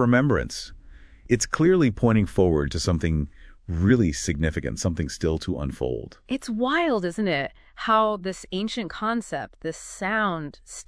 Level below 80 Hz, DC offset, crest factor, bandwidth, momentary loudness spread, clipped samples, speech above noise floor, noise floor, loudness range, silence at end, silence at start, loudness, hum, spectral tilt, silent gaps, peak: -40 dBFS; under 0.1%; 18 dB; 11 kHz; 13 LU; under 0.1%; 23 dB; -46 dBFS; 4 LU; 0.05 s; 0 s; -25 LUFS; none; -5.5 dB/octave; none; -6 dBFS